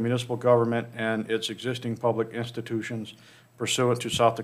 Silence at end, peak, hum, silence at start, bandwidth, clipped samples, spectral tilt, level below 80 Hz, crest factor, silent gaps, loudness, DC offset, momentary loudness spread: 0 s; -8 dBFS; none; 0 s; 15.5 kHz; under 0.1%; -5 dB/octave; -64 dBFS; 20 dB; none; -27 LUFS; under 0.1%; 11 LU